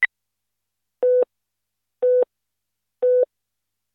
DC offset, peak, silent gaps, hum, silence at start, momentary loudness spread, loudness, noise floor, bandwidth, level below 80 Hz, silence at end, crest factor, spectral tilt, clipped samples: under 0.1%; -6 dBFS; none; 50 Hz at -90 dBFS; 0 s; 7 LU; -21 LUFS; -82 dBFS; 4.1 kHz; -88 dBFS; 0.7 s; 18 dB; -4.5 dB/octave; under 0.1%